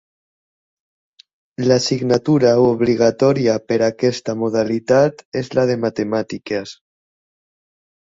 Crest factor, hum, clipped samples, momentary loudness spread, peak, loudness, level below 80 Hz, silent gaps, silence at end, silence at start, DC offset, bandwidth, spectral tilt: 18 dB; none; under 0.1%; 10 LU; -2 dBFS; -17 LUFS; -56 dBFS; 5.25-5.32 s; 1.4 s; 1.6 s; under 0.1%; 7.8 kHz; -6 dB/octave